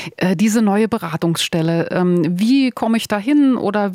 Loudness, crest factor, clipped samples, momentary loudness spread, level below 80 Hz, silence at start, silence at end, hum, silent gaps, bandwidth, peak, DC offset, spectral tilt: -17 LUFS; 12 dB; under 0.1%; 5 LU; -60 dBFS; 0 s; 0 s; none; none; 16 kHz; -4 dBFS; under 0.1%; -5.5 dB/octave